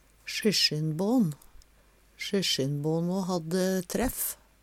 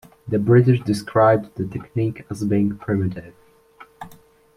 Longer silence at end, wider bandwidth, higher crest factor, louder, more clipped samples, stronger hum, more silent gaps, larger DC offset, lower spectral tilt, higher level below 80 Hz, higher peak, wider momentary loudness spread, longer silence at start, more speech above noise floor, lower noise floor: second, 0.3 s vs 0.5 s; first, 17 kHz vs 13 kHz; about the same, 18 dB vs 18 dB; second, -28 LUFS vs -20 LUFS; neither; neither; neither; neither; second, -4.5 dB/octave vs -8.5 dB/octave; about the same, -52 dBFS vs -52 dBFS; second, -12 dBFS vs -4 dBFS; second, 8 LU vs 23 LU; about the same, 0.25 s vs 0.25 s; about the same, 33 dB vs 30 dB; first, -61 dBFS vs -49 dBFS